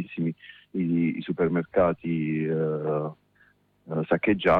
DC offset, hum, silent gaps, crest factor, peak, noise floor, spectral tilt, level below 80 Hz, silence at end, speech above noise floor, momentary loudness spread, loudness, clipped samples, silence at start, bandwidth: under 0.1%; 50 Hz at -55 dBFS; none; 16 dB; -10 dBFS; -63 dBFS; -9.5 dB/octave; -56 dBFS; 0 s; 38 dB; 9 LU; -27 LUFS; under 0.1%; 0 s; 4.6 kHz